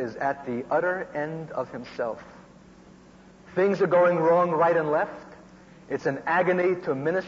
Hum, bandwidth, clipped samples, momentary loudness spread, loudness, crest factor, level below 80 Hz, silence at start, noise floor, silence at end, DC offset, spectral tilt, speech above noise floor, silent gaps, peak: none; 7.6 kHz; under 0.1%; 13 LU; -25 LUFS; 14 dB; -64 dBFS; 0 s; -51 dBFS; 0 s; under 0.1%; -7.5 dB/octave; 26 dB; none; -12 dBFS